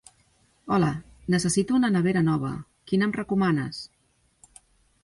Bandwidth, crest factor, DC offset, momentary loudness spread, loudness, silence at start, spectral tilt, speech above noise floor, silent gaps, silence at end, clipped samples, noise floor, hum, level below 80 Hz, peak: 11.5 kHz; 18 dB; under 0.1%; 13 LU; -25 LUFS; 0.65 s; -6 dB/octave; 40 dB; none; 1.2 s; under 0.1%; -64 dBFS; none; -56 dBFS; -10 dBFS